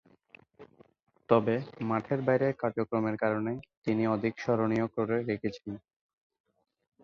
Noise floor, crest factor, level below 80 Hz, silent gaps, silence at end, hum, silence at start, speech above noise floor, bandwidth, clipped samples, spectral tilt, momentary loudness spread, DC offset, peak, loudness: -60 dBFS; 22 dB; -68 dBFS; 3.77-3.82 s; 1.25 s; none; 0.6 s; 30 dB; 7 kHz; under 0.1%; -8.5 dB/octave; 9 LU; under 0.1%; -10 dBFS; -30 LUFS